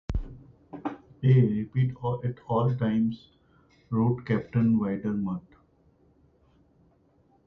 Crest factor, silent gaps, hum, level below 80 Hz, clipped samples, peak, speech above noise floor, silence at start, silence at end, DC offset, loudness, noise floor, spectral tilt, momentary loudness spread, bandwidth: 18 dB; none; none; -46 dBFS; under 0.1%; -10 dBFS; 38 dB; 0.1 s; 2.05 s; under 0.1%; -27 LUFS; -64 dBFS; -10.5 dB/octave; 15 LU; 4.4 kHz